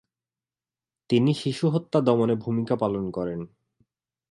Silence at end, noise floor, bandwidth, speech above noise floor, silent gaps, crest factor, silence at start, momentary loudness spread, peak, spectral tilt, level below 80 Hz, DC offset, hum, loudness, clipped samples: 0.85 s; under -90 dBFS; 11.5 kHz; over 66 dB; none; 20 dB; 1.1 s; 10 LU; -6 dBFS; -7.5 dB/octave; -60 dBFS; under 0.1%; none; -25 LUFS; under 0.1%